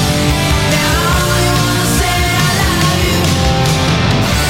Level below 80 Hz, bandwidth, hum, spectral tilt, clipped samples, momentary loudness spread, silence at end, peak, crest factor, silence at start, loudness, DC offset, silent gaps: -22 dBFS; 16.5 kHz; none; -4 dB/octave; under 0.1%; 1 LU; 0 s; -2 dBFS; 12 dB; 0 s; -12 LUFS; 0.9%; none